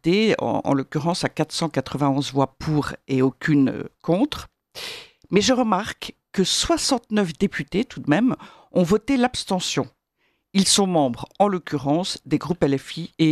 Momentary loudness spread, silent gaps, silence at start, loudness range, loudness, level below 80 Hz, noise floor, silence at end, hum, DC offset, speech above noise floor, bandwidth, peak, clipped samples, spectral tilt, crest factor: 11 LU; none; 0.05 s; 2 LU; -22 LUFS; -50 dBFS; -70 dBFS; 0 s; none; under 0.1%; 48 dB; 14 kHz; -4 dBFS; under 0.1%; -4.5 dB/octave; 18 dB